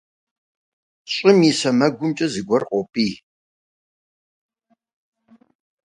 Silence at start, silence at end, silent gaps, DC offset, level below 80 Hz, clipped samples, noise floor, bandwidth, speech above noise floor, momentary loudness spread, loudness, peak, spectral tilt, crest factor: 1.1 s; 2.7 s; none; under 0.1%; -64 dBFS; under 0.1%; under -90 dBFS; 11 kHz; over 72 dB; 10 LU; -19 LUFS; -2 dBFS; -5 dB/octave; 22 dB